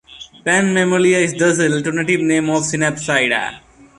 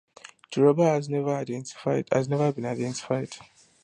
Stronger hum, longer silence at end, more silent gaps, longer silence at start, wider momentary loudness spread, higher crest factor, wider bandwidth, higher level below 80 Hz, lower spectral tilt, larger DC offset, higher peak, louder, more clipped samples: neither; about the same, 0.4 s vs 0.4 s; neither; second, 0.1 s vs 0.5 s; second, 5 LU vs 12 LU; second, 14 dB vs 20 dB; about the same, 11.5 kHz vs 11 kHz; first, -54 dBFS vs -70 dBFS; second, -4 dB/octave vs -6.5 dB/octave; neither; first, -2 dBFS vs -8 dBFS; first, -16 LUFS vs -26 LUFS; neither